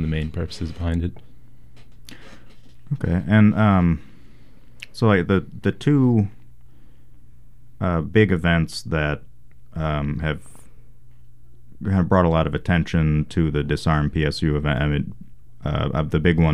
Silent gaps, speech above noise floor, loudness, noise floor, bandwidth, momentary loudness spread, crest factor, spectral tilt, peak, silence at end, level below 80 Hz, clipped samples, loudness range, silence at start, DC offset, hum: none; 29 dB; -21 LUFS; -49 dBFS; 12 kHz; 11 LU; 18 dB; -7.5 dB/octave; -4 dBFS; 0 s; -36 dBFS; under 0.1%; 5 LU; 0 s; 1%; none